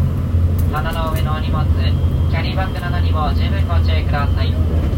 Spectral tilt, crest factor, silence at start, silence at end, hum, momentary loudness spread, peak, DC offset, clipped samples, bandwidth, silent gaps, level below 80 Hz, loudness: -7.5 dB/octave; 10 dB; 0 s; 0 s; none; 3 LU; -6 dBFS; under 0.1%; under 0.1%; 16.5 kHz; none; -22 dBFS; -18 LUFS